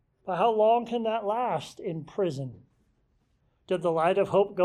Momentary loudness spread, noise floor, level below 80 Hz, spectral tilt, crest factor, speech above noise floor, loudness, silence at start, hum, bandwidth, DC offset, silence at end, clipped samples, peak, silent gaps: 12 LU; -70 dBFS; -68 dBFS; -6.5 dB/octave; 16 dB; 43 dB; -27 LUFS; 0.25 s; none; 12 kHz; under 0.1%; 0 s; under 0.1%; -12 dBFS; none